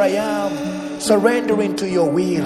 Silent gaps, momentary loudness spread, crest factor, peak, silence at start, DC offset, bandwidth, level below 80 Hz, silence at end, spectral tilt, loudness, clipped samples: none; 9 LU; 16 dB; -2 dBFS; 0 s; under 0.1%; 14.5 kHz; -56 dBFS; 0 s; -5 dB/octave; -19 LUFS; under 0.1%